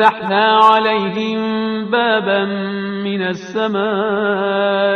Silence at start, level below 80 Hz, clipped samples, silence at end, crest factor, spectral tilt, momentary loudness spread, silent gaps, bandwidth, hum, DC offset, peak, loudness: 0 s; -62 dBFS; under 0.1%; 0 s; 16 dB; -6 dB/octave; 10 LU; none; 7.6 kHz; none; under 0.1%; 0 dBFS; -16 LUFS